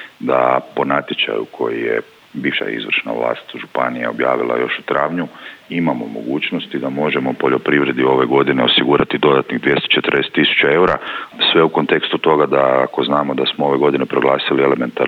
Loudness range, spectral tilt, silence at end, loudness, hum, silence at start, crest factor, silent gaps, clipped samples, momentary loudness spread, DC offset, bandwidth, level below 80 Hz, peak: 6 LU; -7 dB/octave; 0 s; -16 LUFS; none; 0 s; 16 dB; none; under 0.1%; 9 LU; under 0.1%; 7.4 kHz; -54 dBFS; -2 dBFS